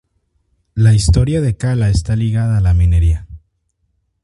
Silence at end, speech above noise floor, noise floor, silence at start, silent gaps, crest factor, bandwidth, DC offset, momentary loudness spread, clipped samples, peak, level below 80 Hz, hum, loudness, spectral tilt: 0.85 s; 53 dB; -65 dBFS; 0.75 s; none; 14 dB; 11.5 kHz; under 0.1%; 5 LU; under 0.1%; 0 dBFS; -22 dBFS; none; -14 LUFS; -6.5 dB/octave